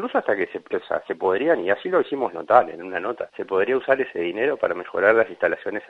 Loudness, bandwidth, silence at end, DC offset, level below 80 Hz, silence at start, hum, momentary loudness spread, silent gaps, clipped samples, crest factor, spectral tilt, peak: -22 LUFS; 5.4 kHz; 0.05 s; under 0.1%; -68 dBFS; 0 s; none; 10 LU; none; under 0.1%; 22 dB; -7 dB/octave; 0 dBFS